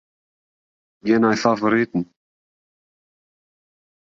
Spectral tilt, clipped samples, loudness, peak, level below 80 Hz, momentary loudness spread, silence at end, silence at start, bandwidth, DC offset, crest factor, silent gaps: -6 dB/octave; under 0.1%; -19 LUFS; -2 dBFS; -64 dBFS; 12 LU; 2.1 s; 1.05 s; 7.6 kHz; under 0.1%; 22 dB; none